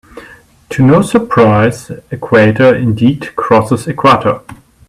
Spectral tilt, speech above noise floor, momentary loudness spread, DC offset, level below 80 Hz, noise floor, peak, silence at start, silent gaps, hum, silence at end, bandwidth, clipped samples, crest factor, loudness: -7 dB/octave; 29 dB; 14 LU; under 0.1%; -42 dBFS; -39 dBFS; 0 dBFS; 0.15 s; none; none; 0.35 s; 14 kHz; under 0.1%; 10 dB; -10 LUFS